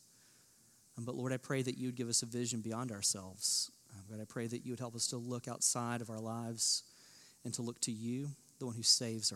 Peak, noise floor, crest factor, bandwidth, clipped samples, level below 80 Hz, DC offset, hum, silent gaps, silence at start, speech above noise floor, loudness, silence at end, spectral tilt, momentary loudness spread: -16 dBFS; -67 dBFS; 24 dB; 16.5 kHz; under 0.1%; -86 dBFS; under 0.1%; none; none; 0.95 s; 28 dB; -37 LUFS; 0 s; -3 dB/octave; 13 LU